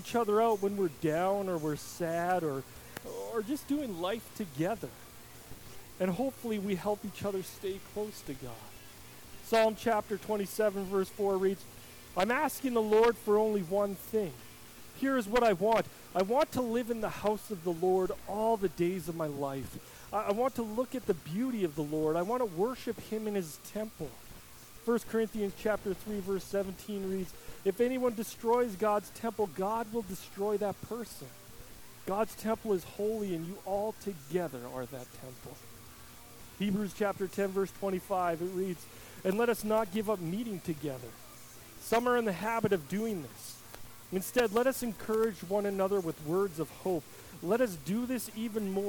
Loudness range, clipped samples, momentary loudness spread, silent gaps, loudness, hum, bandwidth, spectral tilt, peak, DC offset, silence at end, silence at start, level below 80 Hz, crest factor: 6 LU; under 0.1%; 19 LU; none; -33 LUFS; none; 19 kHz; -5.5 dB/octave; -16 dBFS; under 0.1%; 0 s; 0 s; -60 dBFS; 16 dB